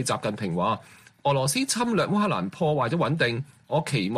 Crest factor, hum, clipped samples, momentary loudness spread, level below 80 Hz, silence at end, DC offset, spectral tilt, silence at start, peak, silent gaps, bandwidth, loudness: 16 dB; none; under 0.1%; 5 LU; -60 dBFS; 0 s; under 0.1%; -5 dB/octave; 0 s; -10 dBFS; none; 15 kHz; -25 LUFS